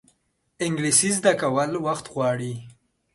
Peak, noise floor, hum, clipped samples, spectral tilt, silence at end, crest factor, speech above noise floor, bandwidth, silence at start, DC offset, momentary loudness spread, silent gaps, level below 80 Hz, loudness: -4 dBFS; -69 dBFS; none; under 0.1%; -3.5 dB/octave; 0.45 s; 20 dB; 46 dB; 12 kHz; 0.6 s; under 0.1%; 11 LU; none; -64 dBFS; -22 LUFS